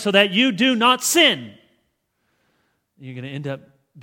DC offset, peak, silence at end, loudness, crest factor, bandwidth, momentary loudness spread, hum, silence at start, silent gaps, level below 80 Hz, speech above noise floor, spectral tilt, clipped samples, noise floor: under 0.1%; 0 dBFS; 0 s; -16 LUFS; 20 dB; 18.5 kHz; 20 LU; none; 0 s; none; -68 dBFS; 52 dB; -2.5 dB/octave; under 0.1%; -71 dBFS